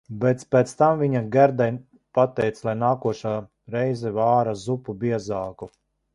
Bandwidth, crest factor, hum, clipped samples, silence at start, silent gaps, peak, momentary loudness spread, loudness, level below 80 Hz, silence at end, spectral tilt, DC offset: 11.5 kHz; 18 dB; none; under 0.1%; 0.1 s; none; -4 dBFS; 12 LU; -23 LUFS; -58 dBFS; 0.45 s; -7.5 dB/octave; under 0.1%